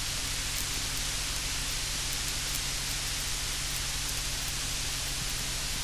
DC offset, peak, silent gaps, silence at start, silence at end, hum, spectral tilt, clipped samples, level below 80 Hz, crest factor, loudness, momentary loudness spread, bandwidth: under 0.1%; -12 dBFS; none; 0 s; 0 s; none; -1 dB/octave; under 0.1%; -40 dBFS; 22 dB; -31 LUFS; 1 LU; 16 kHz